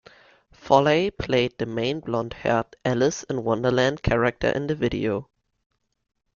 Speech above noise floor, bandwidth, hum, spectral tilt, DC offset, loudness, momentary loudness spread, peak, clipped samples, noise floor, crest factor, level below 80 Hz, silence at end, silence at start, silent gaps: 32 dB; 7.4 kHz; none; -5.5 dB/octave; under 0.1%; -24 LUFS; 7 LU; -2 dBFS; under 0.1%; -55 dBFS; 22 dB; -46 dBFS; 1.15 s; 0.65 s; none